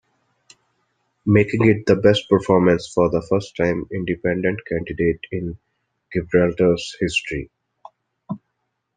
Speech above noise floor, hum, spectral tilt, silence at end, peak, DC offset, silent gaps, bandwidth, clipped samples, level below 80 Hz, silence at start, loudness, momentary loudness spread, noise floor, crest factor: 56 dB; none; -6.5 dB/octave; 0.6 s; -2 dBFS; under 0.1%; none; 9.6 kHz; under 0.1%; -48 dBFS; 1.25 s; -20 LUFS; 15 LU; -75 dBFS; 18 dB